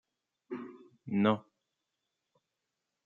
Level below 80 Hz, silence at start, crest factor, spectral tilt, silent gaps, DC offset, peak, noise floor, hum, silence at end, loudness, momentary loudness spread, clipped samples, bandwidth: -80 dBFS; 0.5 s; 22 dB; -6 dB/octave; none; under 0.1%; -16 dBFS; -86 dBFS; none; 1.65 s; -33 LUFS; 20 LU; under 0.1%; 4.1 kHz